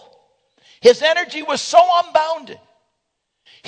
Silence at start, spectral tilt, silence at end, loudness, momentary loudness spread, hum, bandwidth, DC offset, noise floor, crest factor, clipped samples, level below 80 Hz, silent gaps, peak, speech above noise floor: 0.85 s; -1.5 dB/octave; 1.15 s; -15 LUFS; 10 LU; none; 11 kHz; under 0.1%; -74 dBFS; 18 dB; under 0.1%; -68 dBFS; none; 0 dBFS; 59 dB